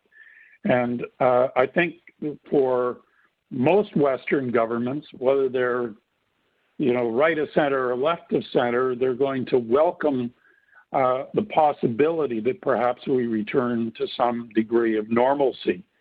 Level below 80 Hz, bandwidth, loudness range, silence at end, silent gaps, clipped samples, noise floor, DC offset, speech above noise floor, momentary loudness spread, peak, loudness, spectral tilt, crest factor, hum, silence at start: -66 dBFS; 4.8 kHz; 1 LU; 0.2 s; none; under 0.1%; -71 dBFS; under 0.1%; 48 dB; 8 LU; -2 dBFS; -23 LUFS; -9.5 dB/octave; 20 dB; none; 0.65 s